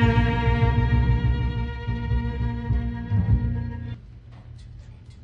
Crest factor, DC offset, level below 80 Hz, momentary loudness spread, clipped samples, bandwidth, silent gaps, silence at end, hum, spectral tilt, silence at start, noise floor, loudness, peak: 16 dB; under 0.1%; -28 dBFS; 23 LU; under 0.1%; 5.6 kHz; none; 0 s; none; -9 dB/octave; 0 s; -43 dBFS; -24 LUFS; -8 dBFS